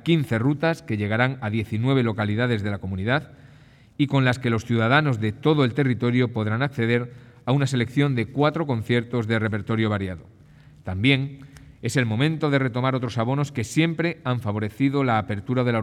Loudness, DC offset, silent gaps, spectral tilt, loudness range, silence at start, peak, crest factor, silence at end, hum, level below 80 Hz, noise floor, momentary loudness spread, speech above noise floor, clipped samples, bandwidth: -23 LUFS; under 0.1%; none; -7 dB/octave; 3 LU; 0.05 s; -4 dBFS; 18 dB; 0 s; none; -58 dBFS; -51 dBFS; 7 LU; 28 dB; under 0.1%; 13 kHz